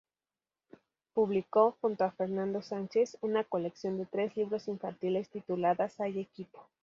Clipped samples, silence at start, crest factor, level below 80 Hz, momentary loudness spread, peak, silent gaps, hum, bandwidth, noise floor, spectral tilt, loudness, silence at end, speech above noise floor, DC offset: under 0.1%; 1.15 s; 20 dB; -78 dBFS; 9 LU; -14 dBFS; none; none; 7.4 kHz; under -90 dBFS; -7 dB/octave; -33 LUFS; 0.2 s; over 58 dB; under 0.1%